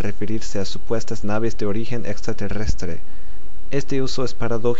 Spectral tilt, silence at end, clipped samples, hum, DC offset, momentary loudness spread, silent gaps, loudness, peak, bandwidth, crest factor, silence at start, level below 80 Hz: -6 dB/octave; 0 s; under 0.1%; none; 30%; 13 LU; none; -26 LUFS; -4 dBFS; 8 kHz; 18 dB; 0 s; -34 dBFS